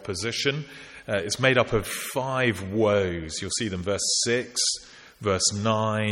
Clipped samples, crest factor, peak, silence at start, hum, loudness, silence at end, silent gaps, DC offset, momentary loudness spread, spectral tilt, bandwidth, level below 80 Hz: under 0.1%; 20 dB; -6 dBFS; 0 s; none; -25 LUFS; 0 s; none; under 0.1%; 9 LU; -3.5 dB/octave; 16.5 kHz; -50 dBFS